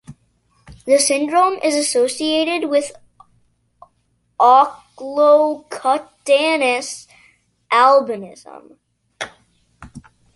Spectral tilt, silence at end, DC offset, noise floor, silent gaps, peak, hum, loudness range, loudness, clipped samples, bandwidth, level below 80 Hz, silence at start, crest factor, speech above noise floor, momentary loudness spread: -2 dB/octave; 0.35 s; under 0.1%; -65 dBFS; none; -2 dBFS; none; 4 LU; -16 LUFS; under 0.1%; 11.5 kHz; -58 dBFS; 0.1 s; 16 dB; 48 dB; 19 LU